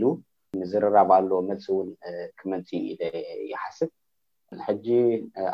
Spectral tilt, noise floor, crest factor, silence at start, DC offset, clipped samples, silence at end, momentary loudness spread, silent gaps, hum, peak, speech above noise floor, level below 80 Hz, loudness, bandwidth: -8 dB/octave; -78 dBFS; 20 dB; 0 s; under 0.1%; under 0.1%; 0 s; 16 LU; none; none; -6 dBFS; 53 dB; -68 dBFS; -26 LUFS; 6.8 kHz